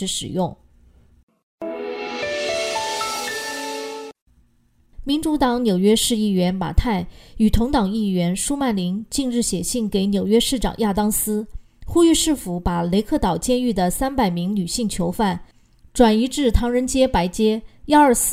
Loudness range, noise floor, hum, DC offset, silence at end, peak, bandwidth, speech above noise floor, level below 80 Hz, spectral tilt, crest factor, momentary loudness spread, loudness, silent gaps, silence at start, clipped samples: 6 LU; -59 dBFS; none; under 0.1%; 0 s; -2 dBFS; 16 kHz; 40 dB; -32 dBFS; -4.5 dB/octave; 18 dB; 11 LU; -20 LUFS; 1.23-1.27 s, 1.43-1.58 s, 4.22-4.26 s; 0 s; under 0.1%